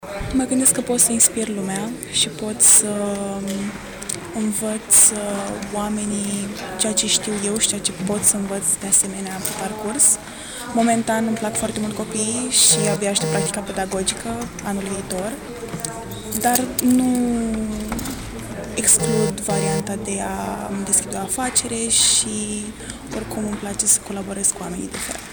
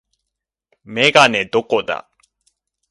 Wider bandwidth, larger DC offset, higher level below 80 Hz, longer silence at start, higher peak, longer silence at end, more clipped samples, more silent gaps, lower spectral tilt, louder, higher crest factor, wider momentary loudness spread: first, over 20 kHz vs 11.5 kHz; neither; first, -44 dBFS vs -60 dBFS; second, 0 s vs 0.9 s; second, -6 dBFS vs 0 dBFS; second, 0 s vs 0.9 s; neither; neither; about the same, -2.5 dB/octave vs -3 dB/octave; second, -19 LUFS vs -15 LUFS; second, 14 dB vs 20 dB; about the same, 14 LU vs 16 LU